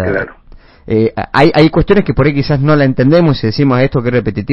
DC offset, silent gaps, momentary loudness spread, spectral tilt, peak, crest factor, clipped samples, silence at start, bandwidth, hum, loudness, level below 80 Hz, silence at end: under 0.1%; none; 7 LU; -9 dB/octave; 0 dBFS; 10 dB; under 0.1%; 0 s; 7 kHz; none; -11 LUFS; -30 dBFS; 0 s